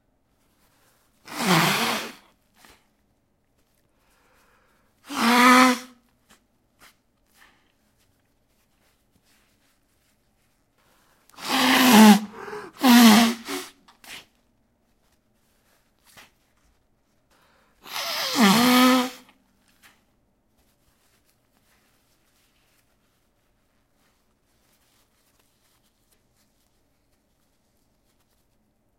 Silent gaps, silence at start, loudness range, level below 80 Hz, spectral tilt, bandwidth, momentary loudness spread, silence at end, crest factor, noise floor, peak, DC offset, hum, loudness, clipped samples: none; 1.3 s; 15 LU; -70 dBFS; -3.5 dB/octave; 16.5 kHz; 25 LU; 9.85 s; 24 dB; -68 dBFS; 0 dBFS; under 0.1%; none; -18 LUFS; under 0.1%